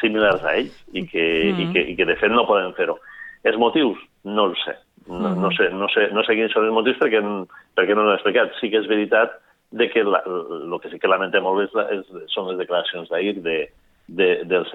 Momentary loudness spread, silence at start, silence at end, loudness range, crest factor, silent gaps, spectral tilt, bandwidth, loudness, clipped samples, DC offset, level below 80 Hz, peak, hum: 11 LU; 0 s; 0 s; 4 LU; 18 dB; none; -7 dB/octave; 5.4 kHz; -20 LUFS; under 0.1%; under 0.1%; -56 dBFS; -4 dBFS; none